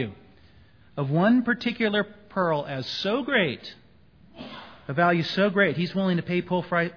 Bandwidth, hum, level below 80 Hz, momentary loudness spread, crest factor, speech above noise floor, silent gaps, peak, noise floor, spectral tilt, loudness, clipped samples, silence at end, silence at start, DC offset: 5.4 kHz; none; -62 dBFS; 19 LU; 20 dB; 31 dB; none; -6 dBFS; -56 dBFS; -7 dB/octave; -25 LUFS; under 0.1%; 0 s; 0 s; 0.1%